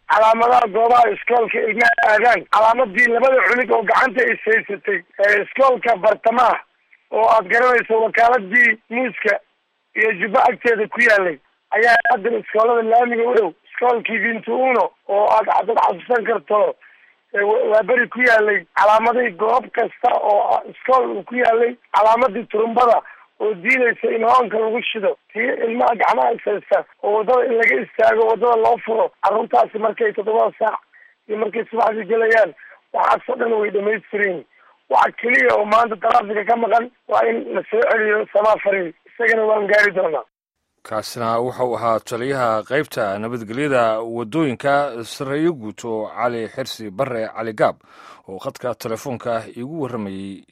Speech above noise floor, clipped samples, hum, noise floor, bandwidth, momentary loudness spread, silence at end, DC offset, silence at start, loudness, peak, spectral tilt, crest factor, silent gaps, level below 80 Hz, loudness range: 57 dB; under 0.1%; none; -74 dBFS; 14 kHz; 11 LU; 0.15 s; under 0.1%; 0.1 s; -17 LUFS; -2 dBFS; -5 dB/octave; 16 dB; none; -62 dBFS; 6 LU